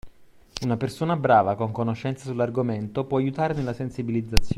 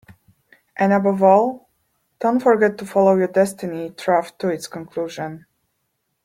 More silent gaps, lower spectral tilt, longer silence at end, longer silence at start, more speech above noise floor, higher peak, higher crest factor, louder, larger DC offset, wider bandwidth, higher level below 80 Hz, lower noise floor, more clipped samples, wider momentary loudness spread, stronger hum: neither; about the same, -6.5 dB/octave vs -6.5 dB/octave; second, 0 s vs 0.85 s; second, 0.05 s vs 0.8 s; second, 25 dB vs 54 dB; about the same, 0 dBFS vs -2 dBFS; first, 24 dB vs 18 dB; second, -25 LUFS vs -19 LUFS; neither; about the same, 15 kHz vs 16 kHz; first, -38 dBFS vs -66 dBFS; second, -49 dBFS vs -73 dBFS; neither; second, 10 LU vs 14 LU; neither